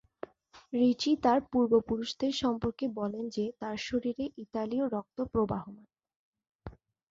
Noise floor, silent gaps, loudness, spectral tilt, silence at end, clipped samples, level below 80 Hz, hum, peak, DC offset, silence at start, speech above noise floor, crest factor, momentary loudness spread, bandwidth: -50 dBFS; 6.16-6.33 s, 6.51-6.59 s; -31 LUFS; -5.5 dB/octave; 0.4 s; under 0.1%; -58 dBFS; none; -12 dBFS; under 0.1%; 0.55 s; 20 dB; 20 dB; 21 LU; 7.8 kHz